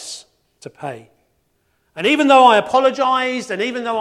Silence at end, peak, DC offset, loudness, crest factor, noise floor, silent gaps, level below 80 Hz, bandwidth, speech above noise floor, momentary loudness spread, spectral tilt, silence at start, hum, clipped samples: 0 s; 0 dBFS; under 0.1%; -15 LUFS; 18 dB; -65 dBFS; none; -66 dBFS; 12.5 kHz; 49 dB; 21 LU; -3.5 dB/octave; 0 s; none; under 0.1%